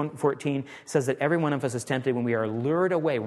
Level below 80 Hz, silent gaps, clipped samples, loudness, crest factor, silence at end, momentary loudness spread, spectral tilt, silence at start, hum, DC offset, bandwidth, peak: -70 dBFS; none; under 0.1%; -27 LUFS; 18 dB; 0 s; 5 LU; -6.5 dB/octave; 0 s; none; under 0.1%; 12.5 kHz; -10 dBFS